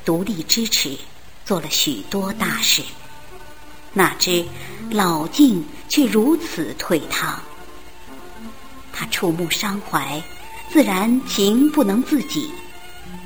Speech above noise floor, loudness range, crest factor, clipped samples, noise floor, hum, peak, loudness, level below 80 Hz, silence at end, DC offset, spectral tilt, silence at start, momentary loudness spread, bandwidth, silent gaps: 23 dB; 6 LU; 20 dB; under 0.1%; -42 dBFS; none; -2 dBFS; -19 LUFS; -48 dBFS; 0 s; 2%; -3.5 dB/octave; 0.05 s; 22 LU; over 20 kHz; none